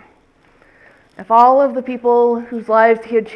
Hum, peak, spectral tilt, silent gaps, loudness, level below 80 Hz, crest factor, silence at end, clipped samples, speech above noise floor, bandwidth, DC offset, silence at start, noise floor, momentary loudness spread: none; 0 dBFS; -7 dB/octave; none; -14 LUFS; -62 dBFS; 16 dB; 0 s; under 0.1%; 39 dB; 5.8 kHz; under 0.1%; 1.2 s; -53 dBFS; 8 LU